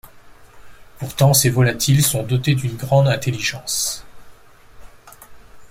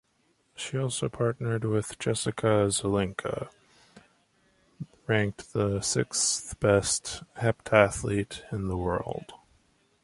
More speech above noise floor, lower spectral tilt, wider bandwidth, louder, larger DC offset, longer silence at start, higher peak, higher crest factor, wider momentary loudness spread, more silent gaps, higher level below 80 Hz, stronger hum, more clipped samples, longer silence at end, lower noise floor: second, 27 dB vs 42 dB; about the same, -4.5 dB/octave vs -4.5 dB/octave; first, 16.5 kHz vs 11.5 kHz; first, -17 LUFS vs -28 LUFS; neither; second, 0.05 s vs 0.6 s; about the same, -2 dBFS vs -4 dBFS; second, 18 dB vs 24 dB; second, 9 LU vs 14 LU; neither; about the same, -46 dBFS vs -50 dBFS; neither; neither; second, 0.05 s vs 0.7 s; second, -45 dBFS vs -70 dBFS